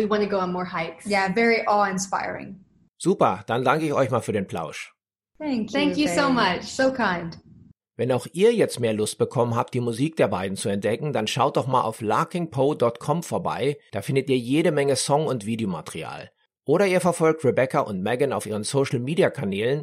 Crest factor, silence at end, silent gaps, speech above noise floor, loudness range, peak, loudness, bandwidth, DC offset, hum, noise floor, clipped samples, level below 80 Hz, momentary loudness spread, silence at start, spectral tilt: 20 dB; 0 s; none; 29 dB; 2 LU; -4 dBFS; -23 LUFS; 15.5 kHz; under 0.1%; none; -52 dBFS; under 0.1%; -62 dBFS; 10 LU; 0 s; -5 dB/octave